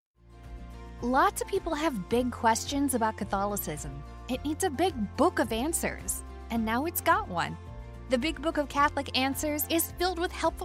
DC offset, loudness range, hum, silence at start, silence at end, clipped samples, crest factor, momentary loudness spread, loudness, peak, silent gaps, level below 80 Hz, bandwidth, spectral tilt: under 0.1%; 2 LU; none; 0.25 s; 0 s; under 0.1%; 18 dB; 12 LU; -29 LUFS; -12 dBFS; none; -46 dBFS; 16 kHz; -4 dB/octave